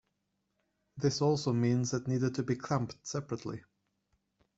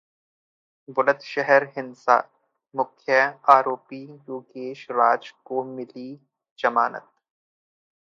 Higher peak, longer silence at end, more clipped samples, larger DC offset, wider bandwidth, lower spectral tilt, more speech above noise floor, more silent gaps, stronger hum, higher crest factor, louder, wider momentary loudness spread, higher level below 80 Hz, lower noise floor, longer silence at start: second, -16 dBFS vs -2 dBFS; second, 0.95 s vs 1.2 s; neither; neither; first, 8 kHz vs 7.2 kHz; about the same, -6 dB/octave vs -5 dB/octave; second, 49 dB vs over 67 dB; second, none vs 6.51-6.56 s; neither; second, 18 dB vs 24 dB; second, -33 LUFS vs -22 LUFS; second, 10 LU vs 19 LU; first, -68 dBFS vs -82 dBFS; second, -81 dBFS vs under -90 dBFS; about the same, 0.95 s vs 0.9 s